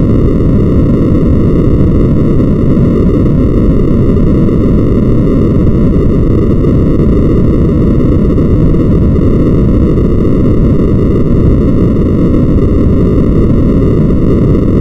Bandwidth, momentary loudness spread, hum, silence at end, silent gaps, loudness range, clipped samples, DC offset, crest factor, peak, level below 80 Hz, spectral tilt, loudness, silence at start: 6.4 kHz; 1 LU; none; 0 s; none; 0 LU; 0.1%; under 0.1%; 6 dB; 0 dBFS; -14 dBFS; -11 dB/octave; -9 LUFS; 0 s